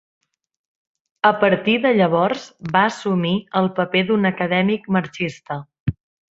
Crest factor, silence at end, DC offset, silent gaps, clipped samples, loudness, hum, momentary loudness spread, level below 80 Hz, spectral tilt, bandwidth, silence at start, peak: 18 dB; 0.4 s; under 0.1%; 5.80-5.86 s; under 0.1%; -19 LUFS; none; 12 LU; -52 dBFS; -6.5 dB/octave; 7.8 kHz; 1.25 s; -2 dBFS